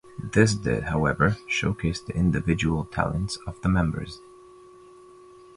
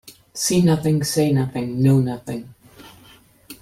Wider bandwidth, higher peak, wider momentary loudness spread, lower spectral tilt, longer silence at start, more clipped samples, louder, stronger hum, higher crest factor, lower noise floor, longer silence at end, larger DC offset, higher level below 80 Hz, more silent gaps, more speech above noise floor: second, 11.5 kHz vs 16 kHz; about the same, -4 dBFS vs -6 dBFS; second, 8 LU vs 14 LU; about the same, -6 dB/octave vs -6 dB/octave; about the same, 0.05 s vs 0.05 s; neither; second, -25 LUFS vs -19 LUFS; neither; about the same, 20 dB vs 16 dB; about the same, -49 dBFS vs -50 dBFS; first, 1.4 s vs 0.1 s; neither; first, -40 dBFS vs -54 dBFS; neither; second, 25 dB vs 32 dB